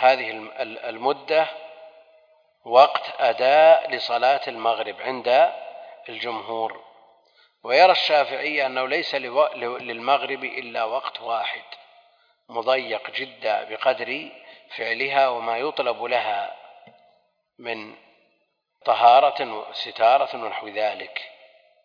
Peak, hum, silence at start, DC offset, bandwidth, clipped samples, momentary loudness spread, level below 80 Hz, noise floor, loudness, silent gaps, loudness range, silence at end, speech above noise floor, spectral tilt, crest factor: -2 dBFS; none; 0 s; under 0.1%; 5.2 kHz; under 0.1%; 18 LU; -84 dBFS; -71 dBFS; -22 LUFS; none; 8 LU; 0.55 s; 49 dB; -4 dB/octave; 22 dB